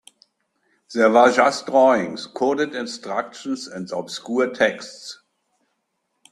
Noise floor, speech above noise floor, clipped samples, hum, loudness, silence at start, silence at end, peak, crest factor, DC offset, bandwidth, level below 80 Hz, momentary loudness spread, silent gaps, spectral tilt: -74 dBFS; 54 dB; under 0.1%; none; -20 LUFS; 0.9 s; 1.15 s; -2 dBFS; 20 dB; under 0.1%; 12 kHz; -68 dBFS; 15 LU; none; -4 dB/octave